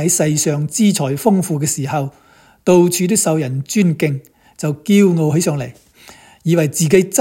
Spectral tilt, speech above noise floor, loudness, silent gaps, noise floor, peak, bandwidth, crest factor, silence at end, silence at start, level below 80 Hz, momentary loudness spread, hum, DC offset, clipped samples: -5 dB/octave; 28 dB; -16 LUFS; none; -43 dBFS; 0 dBFS; 17 kHz; 16 dB; 0 s; 0 s; -56 dBFS; 11 LU; none; under 0.1%; under 0.1%